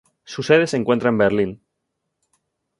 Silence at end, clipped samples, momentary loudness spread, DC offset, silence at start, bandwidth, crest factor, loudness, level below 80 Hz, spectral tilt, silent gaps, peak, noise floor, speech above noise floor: 1.25 s; under 0.1%; 12 LU; under 0.1%; 0.3 s; 11.5 kHz; 20 dB; -19 LUFS; -56 dBFS; -6 dB/octave; none; -2 dBFS; -77 dBFS; 59 dB